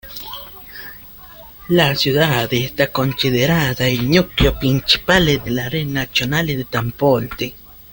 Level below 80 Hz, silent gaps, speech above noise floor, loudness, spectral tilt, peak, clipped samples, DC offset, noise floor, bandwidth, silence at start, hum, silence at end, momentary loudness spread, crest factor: -34 dBFS; none; 22 dB; -17 LUFS; -5 dB/octave; 0 dBFS; under 0.1%; under 0.1%; -39 dBFS; 17 kHz; 0.05 s; none; 0.15 s; 18 LU; 18 dB